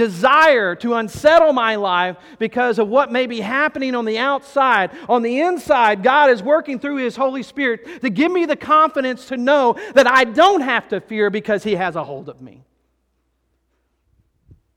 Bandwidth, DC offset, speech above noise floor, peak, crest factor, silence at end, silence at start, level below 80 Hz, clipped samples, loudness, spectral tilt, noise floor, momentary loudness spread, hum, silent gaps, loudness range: 15.5 kHz; under 0.1%; 51 dB; -2 dBFS; 16 dB; 2.3 s; 0 s; -58 dBFS; under 0.1%; -16 LUFS; -4.5 dB/octave; -67 dBFS; 11 LU; none; none; 7 LU